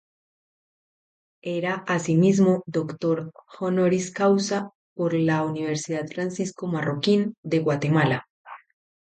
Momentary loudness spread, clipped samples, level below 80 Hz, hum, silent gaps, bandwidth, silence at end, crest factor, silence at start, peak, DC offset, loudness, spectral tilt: 9 LU; under 0.1%; -68 dBFS; none; 4.75-4.96 s, 7.38-7.43 s, 8.30-8.45 s; 9.2 kHz; 0.6 s; 16 dB; 1.45 s; -8 dBFS; under 0.1%; -24 LUFS; -6 dB/octave